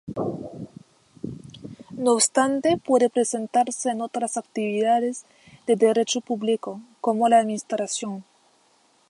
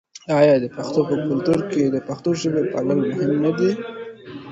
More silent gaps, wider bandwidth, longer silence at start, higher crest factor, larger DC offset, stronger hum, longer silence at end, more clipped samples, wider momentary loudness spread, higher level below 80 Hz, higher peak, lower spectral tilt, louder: neither; about the same, 11.5 kHz vs 10.5 kHz; about the same, 0.05 s vs 0.15 s; about the same, 18 dB vs 18 dB; neither; neither; first, 0.85 s vs 0 s; neither; first, 19 LU vs 12 LU; second, -66 dBFS vs -58 dBFS; second, -6 dBFS vs -2 dBFS; second, -3.5 dB/octave vs -7 dB/octave; second, -23 LUFS vs -20 LUFS